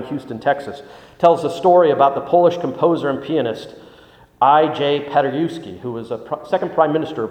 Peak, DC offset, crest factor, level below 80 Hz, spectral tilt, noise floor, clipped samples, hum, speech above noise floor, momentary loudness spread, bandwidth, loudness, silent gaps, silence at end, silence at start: 0 dBFS; under 0.1%; 18 dB; -60 dBFS; -7 dB/octave; -47 dBFS; under 0.1%; none; 30 dB; 15 LU; 9.4 kHz; -17 LUFS; none; 0 s; 0 s